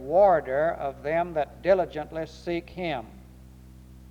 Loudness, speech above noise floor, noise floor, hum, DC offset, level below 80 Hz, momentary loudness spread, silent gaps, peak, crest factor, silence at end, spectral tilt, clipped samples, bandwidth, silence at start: -26 LUFS; 23 dB; -48 dBFS; none; under 0.1%; -50 dBFS; 14 LU; none; -8 dBFS; 18 dB; 0.05 s; -7 dB/octave; under 0.1%; 9.2 kHz; 0 s